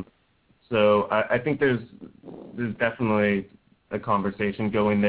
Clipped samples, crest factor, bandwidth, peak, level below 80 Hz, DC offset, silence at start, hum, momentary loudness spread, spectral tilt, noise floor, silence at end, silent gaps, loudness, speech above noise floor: under 0.1%; 18 dB; 4 kHz; -8 dBFS; -56 dBFS; under 0.1%; 0 s; none; 23 LU; -10.5 dB/octave; -64 dBFS; 0 s; none; -24 LUFS; 41 dB